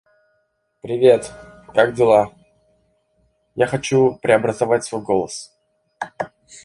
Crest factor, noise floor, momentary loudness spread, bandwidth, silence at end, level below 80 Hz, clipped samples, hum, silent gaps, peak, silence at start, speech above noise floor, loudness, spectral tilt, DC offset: 18 dB; -68 dBFS; 18 LU; 11.5 kHz; 0.4 s; -56 dBFS; under 0.1%; none; none; -2 dBFS; 0.85 s; 51 dB; -18 LUFS; -5.5 dB/octave; under 0.1%